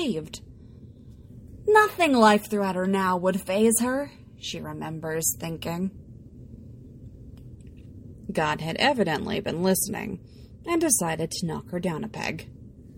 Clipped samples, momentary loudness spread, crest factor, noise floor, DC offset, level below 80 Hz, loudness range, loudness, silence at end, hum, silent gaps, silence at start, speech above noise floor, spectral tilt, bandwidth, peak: under 0.1%; 26 LU; 20 dB; -46 dBFS; under 0.1%; -52 dBFS; 10 LU; -25 LUFS; 0.05 s; none; none; 0 s; 22 dB; -4 dB/octave; 16.5 kHz; -6 dBFS